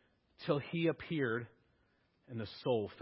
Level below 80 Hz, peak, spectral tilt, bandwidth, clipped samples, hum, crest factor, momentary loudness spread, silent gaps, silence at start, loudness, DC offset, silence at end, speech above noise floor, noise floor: -70 dBFS; -18 dBFS; -5.5 dB/octave; 5.6 kHz; under 0.1%; none; 20 dB; 11 LU; none; 0.4 s; -38 LUFS; under 0.1%; 0 s; 38 dB; -75 dBFS